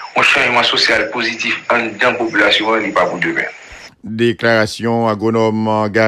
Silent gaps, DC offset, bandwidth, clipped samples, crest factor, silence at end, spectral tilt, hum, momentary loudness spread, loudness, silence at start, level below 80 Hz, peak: none; under 0.1%; 13.5 kHz; under 0.1%; 14 dB; 0 s; -4 dB/octave; none; 7 LU; -14 LUFS; 0 s; -52 dBFS; 0 dBFS